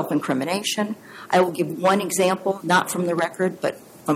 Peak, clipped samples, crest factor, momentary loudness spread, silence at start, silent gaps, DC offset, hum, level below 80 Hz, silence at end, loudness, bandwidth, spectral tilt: -6 dBFS; under 0.1%; 16 dB; 8 LU; 0 s; none; under 0.1%; none; -68 dBFS; 0 s; -22 LUFS; 16.5 kHz; -4.5 dB/octave